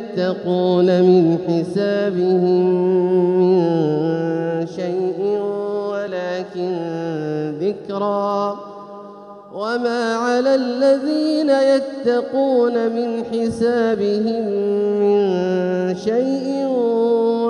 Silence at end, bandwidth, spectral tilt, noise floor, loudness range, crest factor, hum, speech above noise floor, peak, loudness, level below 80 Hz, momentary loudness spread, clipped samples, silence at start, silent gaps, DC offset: 0 s; 10.5 kHz; -7.5 dB/octave; -38 dBFS; 7 LU; 14 dB; none; 20 dB; -4 dBFS; -18 LUFS; -64 dBFS; 9 LU; under 0.1%; 0 s; none; under 0.1%